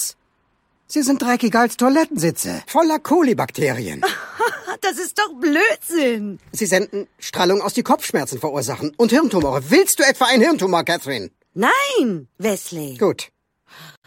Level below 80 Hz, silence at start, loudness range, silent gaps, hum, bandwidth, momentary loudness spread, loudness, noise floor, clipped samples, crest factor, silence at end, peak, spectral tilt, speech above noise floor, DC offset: -56 dBFS; 0 s; 4 LU; none; none; 16.5 kHz; 11 LU; -18 LUFS; -65 dBFS; under 0.1%; 18 dB; 0.15 s; 0 dBFS; -3.5 dB/octave; 47 dB; under 0.1%